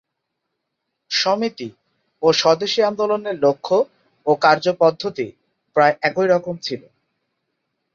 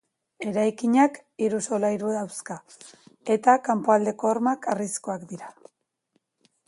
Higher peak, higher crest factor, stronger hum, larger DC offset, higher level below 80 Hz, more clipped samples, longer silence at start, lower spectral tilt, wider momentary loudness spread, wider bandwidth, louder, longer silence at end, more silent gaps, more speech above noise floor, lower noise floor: first, -2 dBFS vs -6 dBFS; about the same, 18 dB vs 20 dB; neither; neither; first, -66 dBFS vs -74 dBFS; neither; first, 1.1 s vs 0.4 s; about the same, -4 dB/octave vs -5 dB/octave; second, 12 LU vs 17 LU; second, 7.6 kHz vs 11.5 kHz; first, -19 LUFS vs -24 LUFS; about the same, 1.15 s vs 1.2 s; neither; first, 60 dB vs 49 dB; first, -77 dBFS vs -73 dBFS